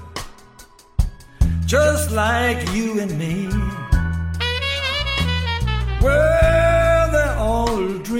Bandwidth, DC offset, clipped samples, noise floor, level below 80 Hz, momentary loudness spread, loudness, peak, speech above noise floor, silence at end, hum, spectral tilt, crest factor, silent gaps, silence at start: 16.5 kHz; under 0.1%; under 0.1%; -46 dBFS; -24 dBFS; 10 LU; -19 LUFS; -4 dBFS; 28 dB; 0 s; none; -5 dB/octave; 14 dB; none; 0 s